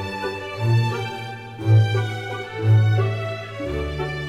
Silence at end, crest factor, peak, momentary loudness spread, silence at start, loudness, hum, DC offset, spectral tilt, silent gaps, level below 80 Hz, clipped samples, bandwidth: 0 s; 14 dB; -8 dBFS; 12 LU; 0 s; -22 LUFS; none; under 0.1%; -7 dB/octave; none; -42 dBFS; under 0.1%; 7.6 kHz